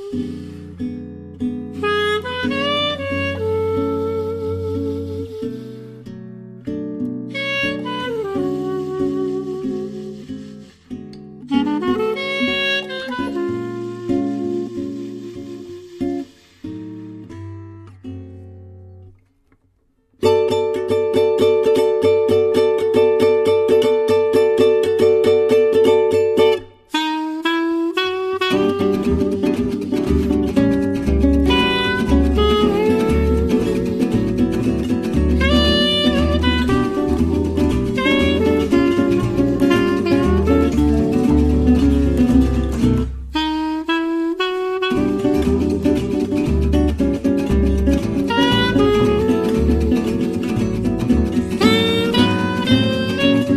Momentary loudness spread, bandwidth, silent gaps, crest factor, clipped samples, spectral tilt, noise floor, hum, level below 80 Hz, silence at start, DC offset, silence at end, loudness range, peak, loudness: 16 LU; 14 kHz; none; 16 dB; under 0.1%; -6.5 dB/octave; -61 dBFS; none; -28 dBFS; 0 s; under 0.1%; 0 s; 10 LU; -2 dBFS; -18 LUFS